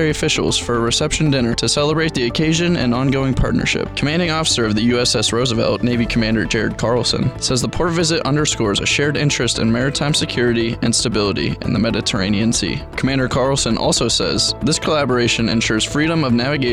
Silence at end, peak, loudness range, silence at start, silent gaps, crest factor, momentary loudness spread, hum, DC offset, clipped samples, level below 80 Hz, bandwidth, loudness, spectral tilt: 0 s; -6 dBFS; 1 LU; 0 s; none; 10 dB; 3 LU; none; 0.2%; under 0.1%; -34 dBFS; 14.5 kHz; -17 LUFS; -4 dB/octave